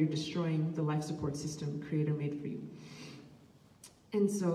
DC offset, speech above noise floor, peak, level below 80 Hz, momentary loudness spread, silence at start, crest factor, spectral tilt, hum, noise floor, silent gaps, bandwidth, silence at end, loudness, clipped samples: under 0.1%; 26 dB; -20 dBFS; -66 dBFS; 18 LU; 0 s; 16 dB; -6.5 dB/octave; none; -60 dBFS; none; 13.5 kHz; 0 s; -35 LUFS; under 0.1%